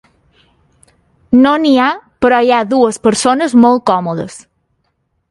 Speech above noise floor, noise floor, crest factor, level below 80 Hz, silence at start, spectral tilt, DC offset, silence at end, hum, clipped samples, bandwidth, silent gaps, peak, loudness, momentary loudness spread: 54 dB; -64 dBFS; 12 dB; -50 dBFS; 1.3 s; -4.5 dB/octave; under 0.1%; 0.95 s; none; under 0.1%; 11.5 kHz; none; 0 dBFS; -11 LUFS; 7 LU